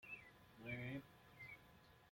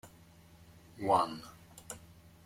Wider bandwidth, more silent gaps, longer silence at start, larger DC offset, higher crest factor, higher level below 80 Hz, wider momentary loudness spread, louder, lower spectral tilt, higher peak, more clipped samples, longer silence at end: about the same, 16.5 kHz vs 16.5 kHz; neither; about the same, 0 s vs 0.05 s; neither; second, 18 dB vs 24 dB; second, -76 dBFS vs -66 dBFS; second, 17 LU vs 26 LU; second, -54 LUFS vs -32 LUFS; first, -6.5 dB/octave vs -5 dB/octave; second, -36 dBFS vs -14 dBFS; neither; second, 0 s vs 0.45 s